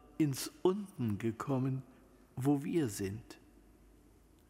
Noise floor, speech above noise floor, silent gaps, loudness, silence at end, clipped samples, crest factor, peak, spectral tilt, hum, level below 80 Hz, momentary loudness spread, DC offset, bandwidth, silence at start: -63 dBFS; 29 dB; none; -36 LUFS; 1.15 s; under 0.1%; 20 dB; -18 dBFS; -6.5 dB/octave; none; -66 dBFS; 14 LU; under 0.1%; 16 kHz; 0.05 s